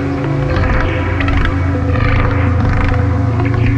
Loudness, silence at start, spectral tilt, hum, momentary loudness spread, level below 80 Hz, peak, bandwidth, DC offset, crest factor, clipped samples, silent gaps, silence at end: -15 LUFS; 0 s; -8.5 dB/octave; none; 2 LU; -20 dBFS; -2 dBFS; 7 kHz; under 0.1%; 12 dB; under 0.1%; none; 0 s